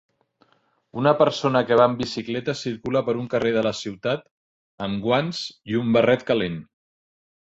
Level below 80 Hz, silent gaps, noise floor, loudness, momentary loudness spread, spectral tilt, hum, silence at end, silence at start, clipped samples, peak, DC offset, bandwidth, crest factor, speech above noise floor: -58 dBFS; 4.31-4.78 s; -63 dBFS; -23 LUFS; 11 LU; -6 dB/octave; none; 0.9 s; 0.95 s; under 0.1%; -4 dBFS; under 0.1%; 8 kHz; 20 dB; 41 dB